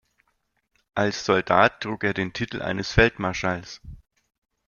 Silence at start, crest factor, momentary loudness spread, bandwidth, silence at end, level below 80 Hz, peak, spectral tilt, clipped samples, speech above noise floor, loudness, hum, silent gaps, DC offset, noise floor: 0.95 s; 24 dB; 13 LU; 7.2 kHz; 0.7 s; -42 dBFS; -2 dBFS; -5 dB/octave; under 0.1%; 49 dB; -23 LUFS; none; none; under 0.1%; -72 dBFS